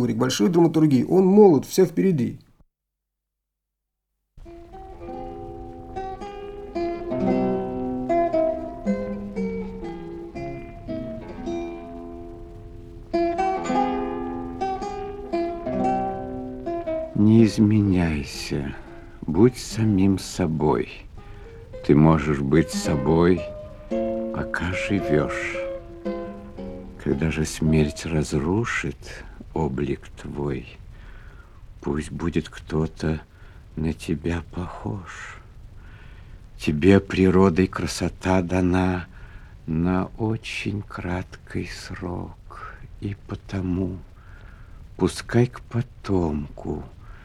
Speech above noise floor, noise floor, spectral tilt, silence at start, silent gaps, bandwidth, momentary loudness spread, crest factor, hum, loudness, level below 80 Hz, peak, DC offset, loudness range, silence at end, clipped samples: 61 dB; -83 dBFS; -7 dB/octave; 0 s; none; 15.5 kHz; 20 LU; 22 dB; none; -24 LUFS; -42 dBFS; -2 dBFS; under 0.1%; 11 LU; 0 s; under 0.1%